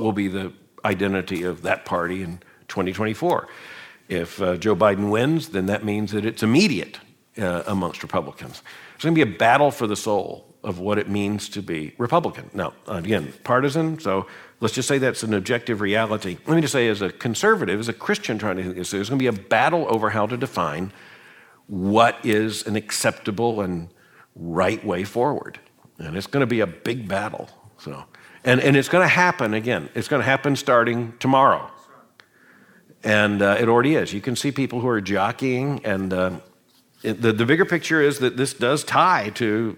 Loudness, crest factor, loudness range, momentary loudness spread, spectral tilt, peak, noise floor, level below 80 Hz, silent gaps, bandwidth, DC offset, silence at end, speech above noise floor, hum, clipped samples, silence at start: -22 LUFS; 20 dB; 5 LU; 14 LU; -5 dB/octave; -2 dBFS; -58 dBFS; -60 dBFS; none; 18 kHz; under 0.1%; 0 s; 37 dB; none; under 0.1%; 0 s